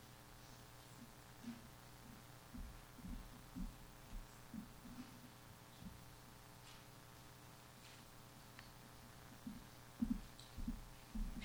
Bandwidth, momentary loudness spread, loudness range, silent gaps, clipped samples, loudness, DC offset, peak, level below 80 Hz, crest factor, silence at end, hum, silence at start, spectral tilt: over 20 kHz; 9 LU; 7 LU; none; under 0.1%; -55 LUFS; under 0.1%; -28 dBFS; -58 dBFS; 24 dB; 0 s; none; 0 s; -5 dB/octave